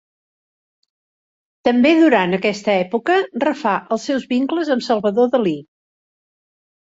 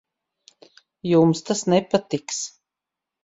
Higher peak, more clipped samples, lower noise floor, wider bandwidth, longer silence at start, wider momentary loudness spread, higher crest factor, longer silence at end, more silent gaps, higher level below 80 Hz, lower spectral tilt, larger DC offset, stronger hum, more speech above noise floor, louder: about the same, -2 dBFS vs -4 dBFS; neither; first, under -90 dBFS vs -86 dBFS; about the same, 8 kHz vs 8 kHz; first, 1.65 s vs 1.05 s; second, 8 LU vs 12 LU; about the same, 16 dB vs 18 dB; first, 1.3 s vs 0.75 s; neither; about the same, -64 dBFS vs -64 dBFS; about the same, -5.5 dB/octave vs -5.5 dB/octave; neither; neither; first, over 73 dB vs 66 dB; first, -17 LUFS vs -22 LUFS